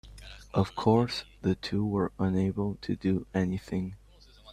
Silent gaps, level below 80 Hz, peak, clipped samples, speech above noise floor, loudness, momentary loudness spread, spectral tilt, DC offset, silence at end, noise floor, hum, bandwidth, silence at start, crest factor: none; -52 dBFS; -10 dBFS; under 0.1%; 26 dB; -30 LUFS; 10 LU; -7.5 dB/octave; under 0.1%; 0 s; -55 dBFS; none; 10.5 kHz; 0.05 s; 20 dB